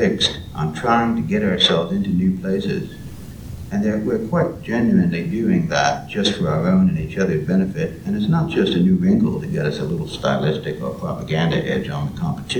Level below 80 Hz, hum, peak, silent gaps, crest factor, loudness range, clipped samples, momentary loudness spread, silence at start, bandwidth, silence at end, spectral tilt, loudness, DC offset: -42 dBFS; none; -2 dBFS; none; 18 dB; 3 LU; under 0.1%; 9 LU; 0 s; 11 kHz; 0 s; -6 dB/octave; -20 LUFS; 0.3%